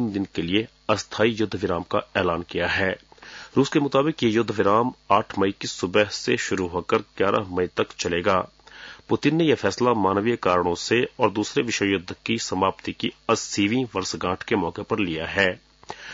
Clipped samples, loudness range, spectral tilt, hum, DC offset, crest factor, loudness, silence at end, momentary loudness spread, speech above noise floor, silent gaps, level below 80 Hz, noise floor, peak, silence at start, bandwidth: under 0.1%; 3 LU; -4.5 dB/octave; none; under 0.1%; 18 dB; -23 LUFS; 0 s; 7 LU; 21 dB; none; -58 dBFS; -44 dBFS; -4 dBFS; 0 s; 7.8 kHz